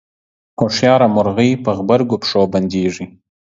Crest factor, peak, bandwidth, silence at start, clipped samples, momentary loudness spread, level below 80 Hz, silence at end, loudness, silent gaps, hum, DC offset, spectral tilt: 16 dB; 0 dBFS; 7.8 kHz; 0.6 s; under 0.1%; 11 LU; -48 dBFS; 0.45 s; -15 LUFS; none; none; under 0.1%; -6 dB/octave